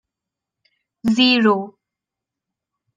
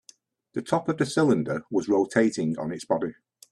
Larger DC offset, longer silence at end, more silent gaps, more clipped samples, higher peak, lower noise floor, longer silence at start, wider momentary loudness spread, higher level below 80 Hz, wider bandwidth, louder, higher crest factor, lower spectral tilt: neither; first, 1.25 s vs 0.4 s; neither; neither; about the same, -4 dBFS vs -6 dBFS; first, -86 dBFS vs -57 dBFS; first, 1.05 s vs 0.55 s; first, 13 LU vs 10 LU; about the same, -62 dBFS vs -64 dBFS; second, 9.2 kHz vs 12.5 kHz; first, -17 LUFS vs -26 LUFS; about the same, 18 dB vs 20 dB; about the same, -5 dB/octave vs -6 dB/octave